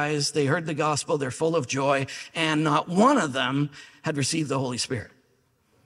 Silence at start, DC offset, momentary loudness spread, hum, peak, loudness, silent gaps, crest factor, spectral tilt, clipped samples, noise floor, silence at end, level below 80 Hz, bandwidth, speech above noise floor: 0 s; under 0.1%; 10 LU; none; -6 dBFS; -25 LUFS; none; 18 dB; -4.5 dB/octave; under 0.1%; -66 dBFS; 0.8 s; -66 dBFS; 14.5 kHz; 42 dB